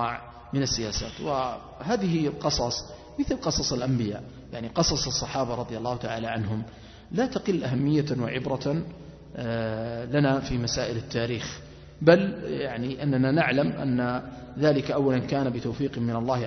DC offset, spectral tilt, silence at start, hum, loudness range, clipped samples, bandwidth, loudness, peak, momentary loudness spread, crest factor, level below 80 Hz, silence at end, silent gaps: under 0.1%; -5 dB/octave; 0 s; none; 3 LU; under 0.1%; 6.4 kHz; -27 LUFS; -4 dBFS; 10 LU; 22 dB; -48 dBFS; 0 s; none